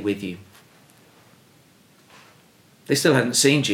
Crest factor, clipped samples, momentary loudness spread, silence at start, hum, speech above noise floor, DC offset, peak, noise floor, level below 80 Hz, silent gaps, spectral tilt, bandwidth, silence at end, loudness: 20 dB; under 0.1%; 17 LU; 0 s; none; 35 dB; under 0.1%; -4 dBFS; -55 dBFS; -72 dBFS; none; -3.5 dB/octave; 18 kHz; 0 s; -20 LUFS